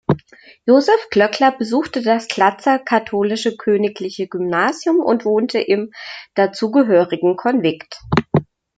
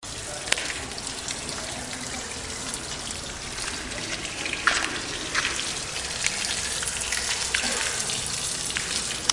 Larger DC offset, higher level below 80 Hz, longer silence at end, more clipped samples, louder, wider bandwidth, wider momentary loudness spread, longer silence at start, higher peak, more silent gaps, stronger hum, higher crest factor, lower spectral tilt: neither; about the same, -52 dBFS vs -48 dBFS; first, 0.35 s vs 0 s; neither; first, -17 LUFS vs -27 LUFS; second, 9.2 kHz vs 11.5 kHz; about the same, 9 LU vs 8 LU; about the same, 0.1 s vs 0 s; about the same, 0 dBFS vs -2 dBFS; neither; neither; second, 16 dB vs 28 dB; first, -6 dB/octave vs -0.5 dB/octave